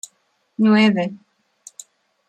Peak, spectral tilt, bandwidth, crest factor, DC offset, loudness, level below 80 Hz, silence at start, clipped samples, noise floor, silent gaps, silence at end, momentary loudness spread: -4 dBFS; -5.5 dB/octave; 10.5 kHz; 16 dB; under 0.1%; -17 LUFS; -68 dBFS; 0.6 s; under 0.1%; -64 dBFS; none; 1.15 s; 25 LU